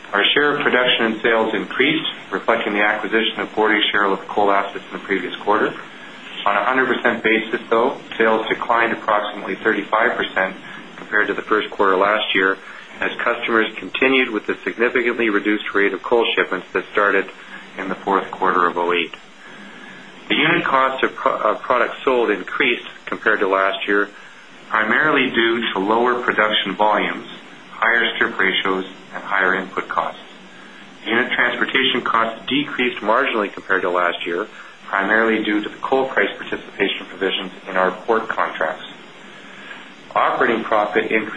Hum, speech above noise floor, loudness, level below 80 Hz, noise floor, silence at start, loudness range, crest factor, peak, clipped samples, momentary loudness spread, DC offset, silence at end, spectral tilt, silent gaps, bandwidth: none; 23 dB; -18 LUFS; -60 dBFS; -42 dBFS; 0 s; 3 LU; 18 dB; -2 dBFS; under 0.1%; 14 LU; 0.4%; 0 s; -5 dB/octave; none; 10 kHz